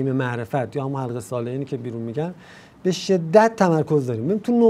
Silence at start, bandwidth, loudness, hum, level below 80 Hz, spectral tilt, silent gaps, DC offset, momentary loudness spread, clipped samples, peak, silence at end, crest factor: 0 s; 15 kHz; -22 LUFS; none; -64 dBFS; -7 dB/octave; none; under 0.1%; 12 LU; under 0.1%; -2 dBFS; 0 s; 20 dB